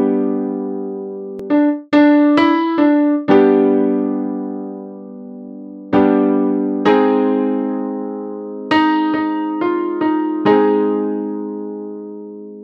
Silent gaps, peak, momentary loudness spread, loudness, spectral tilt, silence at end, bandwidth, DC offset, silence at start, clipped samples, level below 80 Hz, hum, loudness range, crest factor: none; 0 dBFS; 18 LU; -16 LUFS; -8 dB/octave; 0 s; 5.8 kHz; under 0.1%; 0 s; under 0.1%; -60 dBFS; none; 4 LU; 16 dB